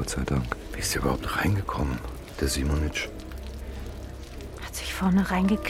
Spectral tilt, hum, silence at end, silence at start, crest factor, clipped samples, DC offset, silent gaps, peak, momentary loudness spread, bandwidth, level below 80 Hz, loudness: -5 dB/octave; none; 0 s; 0 s; 16 dB; under 0.1%; under 0.1%; none; -12 dBFS; 15 LU; 16.5 kHz; -36 dBFS; -28 LUFS